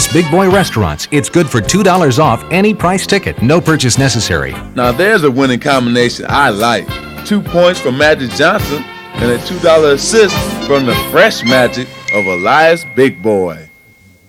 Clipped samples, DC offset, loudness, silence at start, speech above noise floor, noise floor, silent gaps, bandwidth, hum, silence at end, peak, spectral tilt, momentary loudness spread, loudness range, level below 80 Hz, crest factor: 0.1%; under 0.1%; -11 LUFS; 0 s; 33 dB; -44 dBFS; none; 16.5 kHz; none; 0.65 s; 0 dBFS; -4.5 dB/octave; 8 LU; 1 LU; -34 dBFS; 12 dB